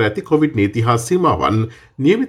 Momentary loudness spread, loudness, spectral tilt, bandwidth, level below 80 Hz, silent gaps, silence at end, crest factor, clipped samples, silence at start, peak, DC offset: 4 LU; -17 LUFS; -6.5 dB/octave; 15 kHz; -46 dBFS; none; 0 s; 14 dB; under 0.1%; 0 s; -2 dBFS; under 0.1%